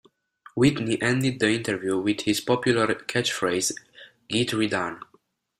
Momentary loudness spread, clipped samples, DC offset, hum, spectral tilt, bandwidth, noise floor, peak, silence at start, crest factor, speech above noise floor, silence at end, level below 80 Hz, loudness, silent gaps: 6 LU; under 0.1%; under 0.1%; none; -4.5 dB/octave; 15.5 kHz; -64 dBFS; -6 dBFS; 0.55 s; 18 dB; 40 dB; 0.6 s; -58 dBFS; -24 LUFS; none